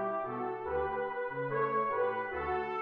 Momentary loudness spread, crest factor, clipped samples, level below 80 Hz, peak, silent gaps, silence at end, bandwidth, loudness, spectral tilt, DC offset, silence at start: 5 LU; 14 dB; under 0.1%; -58 dBFS; -20 dBFS; none; 0 s; 5.2 kHz; -34 LUFS; -8.5 dB/octave; under 0.1%; 0 s